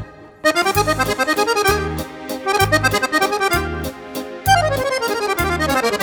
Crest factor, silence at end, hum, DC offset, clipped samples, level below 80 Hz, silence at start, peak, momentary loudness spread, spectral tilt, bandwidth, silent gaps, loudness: 16 dB; 0 s; none; under 0.1%; under 0.1%; -36 dBFS; 0 s; -2 dBFS; 12 LU; -3.5 dB/octave; over 20 kHz; none; -18 LUFS